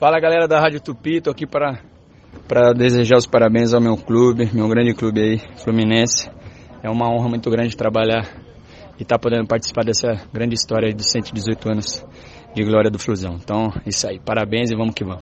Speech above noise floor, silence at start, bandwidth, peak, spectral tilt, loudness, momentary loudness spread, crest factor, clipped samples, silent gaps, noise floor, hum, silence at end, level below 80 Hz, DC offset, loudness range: 24 dB; 0 s; 8.6 kHz; 0 dBFS; -5 dB/octave; -18 LUFS; 9 LU; 18 dB; under 0.1%; none; -41 dBFS; none; 0 s; -46 dBFS; under 0.1%; 5 LU